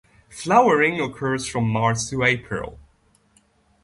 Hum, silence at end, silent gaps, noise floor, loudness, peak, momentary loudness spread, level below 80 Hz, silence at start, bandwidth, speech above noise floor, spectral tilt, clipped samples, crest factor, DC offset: none; 1.1 s; none; -61 dBFS; -21 LUFS; -4 dBFS; 14 LU; -50 dBFS; 0.3 s; 11.5 kHz; 40 dB; -5 dB/octave; under 0.1%; 18 dB; under 0.1%